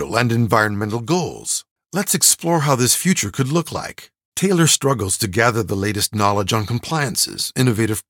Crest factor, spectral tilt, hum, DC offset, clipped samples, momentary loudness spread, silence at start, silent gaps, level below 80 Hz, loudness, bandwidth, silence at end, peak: 18 dB; -3.5 dB/octave; none; under 0.1%; under 0.1%; 9 LU; 0 s; 1.71-1.76 s, 4.25-4.32 s; -54 dBFS; -18 LUFS; 19.5 kHz; 0.1 s; 0 dBFS